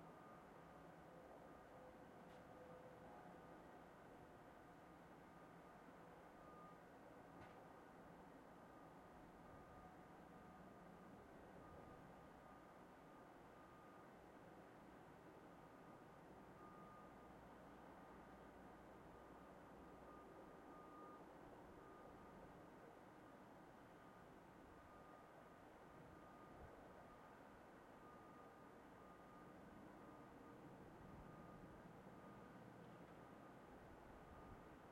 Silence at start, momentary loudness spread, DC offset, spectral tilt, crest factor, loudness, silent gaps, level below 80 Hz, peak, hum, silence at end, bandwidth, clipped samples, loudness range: 0 s; 2 LU; under 0.1%; -6.5 dB/octave; 14 dB; -63 LUFS; none; -78 dBFS; -48 dBFS; none; 0 s; 16 kHz; under 0.1%; 2 LU